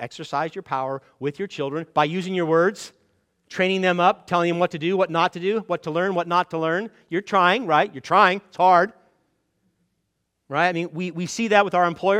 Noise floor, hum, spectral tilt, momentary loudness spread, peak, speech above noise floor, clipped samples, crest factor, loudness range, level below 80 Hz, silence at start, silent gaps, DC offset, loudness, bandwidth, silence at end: -75 dBFS; none; -5 dB/octave; 11 LU; -2 dBFS; 53 dB; under 0.1%; 20 dB; 4 LU; -70 dBFS; 0 s; none; under 0.1%; -22 LUFS; 12.5 kHz; 0 s